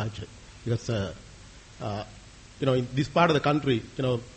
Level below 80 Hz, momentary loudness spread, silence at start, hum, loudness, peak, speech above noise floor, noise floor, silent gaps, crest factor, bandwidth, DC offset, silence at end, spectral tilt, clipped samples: -52 dBFS; 20 LU; 0 s; none; -27 LUFS; -8 dBFS; 21 dB; -48 dBFS; none; 22 dB; 8.4 kHz; under 0.1%; 0 s; -6.5 dB/octave; under 0.1%